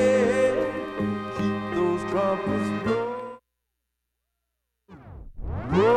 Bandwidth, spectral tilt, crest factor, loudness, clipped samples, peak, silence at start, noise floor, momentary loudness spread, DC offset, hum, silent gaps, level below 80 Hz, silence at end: 11 kHz; -6.5 dB/octave; 16 dB; -26 LUFS; under 0.1%; -10 dBFS; 0 s; -81 dBFS; 19 LU; under 0.1%; 60 Hz at -60 dBFS; none; -46 dBFS; 0 s